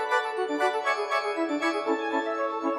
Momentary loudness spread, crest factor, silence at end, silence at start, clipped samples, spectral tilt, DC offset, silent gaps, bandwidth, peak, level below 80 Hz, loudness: 3 LU; 16 dB; 0 s; 0 s; under 0.1%; -2 dB/octave; under 0.1%; none; 13.5 kHz; -12 dBFS; -90 dBFS; -27 LUFS